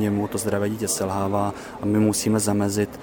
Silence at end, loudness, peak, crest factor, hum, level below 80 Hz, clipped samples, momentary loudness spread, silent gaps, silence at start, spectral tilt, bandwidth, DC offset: 0 s; -23 LUFS; -8 dBFS; 16 dB; none; -52 dBFS; under 0.1%; 5 LU; none; 0 s; -5 dB/octave; 19 kHz; under 0.1%